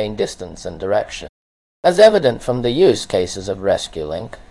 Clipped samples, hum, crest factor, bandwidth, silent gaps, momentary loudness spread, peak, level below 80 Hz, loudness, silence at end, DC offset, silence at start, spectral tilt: under 0.1%; none; 18 dB; 12 kHz; 1.29-1.83 s; 17 LU; 0 dBFS; -44 dBFS; -17 LUFS; 0.1 s; under 0.1%; 0 s; -5 dB/octave